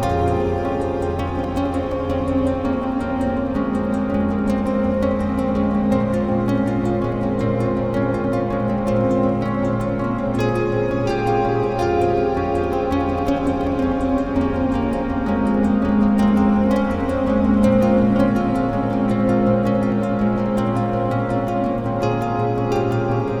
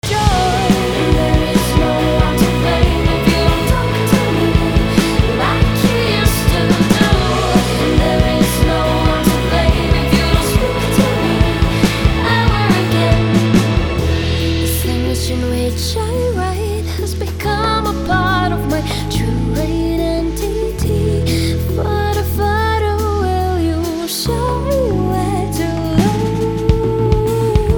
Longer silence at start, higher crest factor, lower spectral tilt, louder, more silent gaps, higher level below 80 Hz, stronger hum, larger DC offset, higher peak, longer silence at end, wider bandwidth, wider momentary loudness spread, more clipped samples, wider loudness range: about the same, 0 s vs 0.05 s; about the same, 14 dB vs 14 dB; first, -8.5 dB/octave vs -5.5 dB/octave; second, -20 LUFS vs -15 LUFS; neither; second, -36 dBFS vs -22 dBFS; neither; neither; second, -4 dBFS vs 0 dBFS; about the same, 0 s vs 0 s; second, 11.5 kHz vs over 20 kHz; about the same, 5 LU vs 5 LU; neither; about the same, 3 LU vs 4 LU